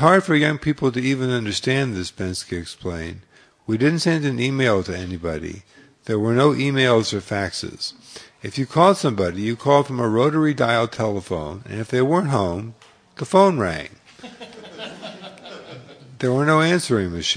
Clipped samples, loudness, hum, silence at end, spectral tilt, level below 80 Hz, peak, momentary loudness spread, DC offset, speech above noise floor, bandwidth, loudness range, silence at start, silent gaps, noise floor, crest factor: under 0.1%; -20 LUFS; none; 0 s; -5.5 dB/octave; -50 dBFS; 0 dBFS; 21 LU; under 0.1%; 21 dB; 10.5 kHz; 4 LU; 0 s; none; -41 dBFS; 20 dB